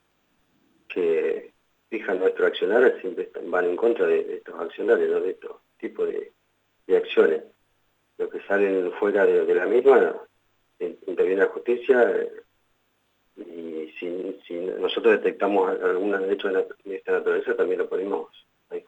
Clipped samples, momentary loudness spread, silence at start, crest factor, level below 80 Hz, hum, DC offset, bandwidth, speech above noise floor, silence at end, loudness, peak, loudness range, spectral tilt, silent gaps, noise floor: under 0.1%; 15 LU; 0.9 s; 18 dB; -78 dBFS; 50 Hz at -80 dBFS; under 0.1%; 7.4 kHz; 46 dB; 0.05 s; -24 LUFS; -6 dBFS; 5 LU; -6.5 dB/octave; none; -69 dBFS